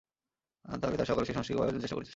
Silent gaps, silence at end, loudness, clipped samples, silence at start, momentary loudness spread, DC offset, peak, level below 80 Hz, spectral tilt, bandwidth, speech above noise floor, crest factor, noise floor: none; 0 s; -33 LUFS; under 0.1%; 0.65 s; 5 LU; under 0.1%; -16 dBFS; -54 dBFS; -6.5 dB/octave; 8 kHz; over 57 dB; 18 dB; under -90 dBFS